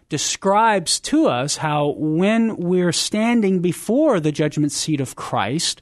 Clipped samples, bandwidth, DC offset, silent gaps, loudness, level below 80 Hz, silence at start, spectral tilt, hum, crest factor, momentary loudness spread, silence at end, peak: under 0.1%; 12.5 kHz; under 0.1%; none; -19 LUFS; -56 dBFS; 0.1 s; -4.5 dB/octave; none; 14 dB; 5 LU; 0.05 s; -6 dBFS